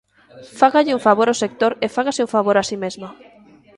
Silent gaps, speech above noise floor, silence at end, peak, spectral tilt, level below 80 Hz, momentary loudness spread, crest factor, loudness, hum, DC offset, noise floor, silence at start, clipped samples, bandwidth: none; 30 dB; 0.65 s; 0 dBFS; -4 dB/octave; -62 dBFS; 12 LU; 18 dB; -18 LUFS; none; under 0.1%; -48 dBFS; 0.35 s; under 0.1%; 11.5 kHz